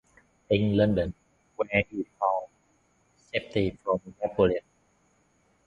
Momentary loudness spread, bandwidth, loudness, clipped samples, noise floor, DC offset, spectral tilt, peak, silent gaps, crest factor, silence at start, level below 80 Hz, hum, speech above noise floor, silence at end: 10 LU; 7.6 kHz; -28 LUFS; under 0.1%; -67 dBFS; under 0.1%; -8 dB/octave; -6 dBFS; none; 22 dB; 0.5 s; -50 dBFS; none; 41 dB; 1.05 s